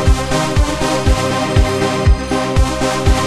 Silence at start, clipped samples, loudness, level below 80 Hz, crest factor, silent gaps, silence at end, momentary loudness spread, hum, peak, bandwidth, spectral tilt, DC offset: 0 s; under 0.1%; -15 LUFS; -18 dBFS; 14 dB; none; 0 s; 2 LU; none; 0 dBFS; 14 kHz; -5 dB/octave; under 0.1%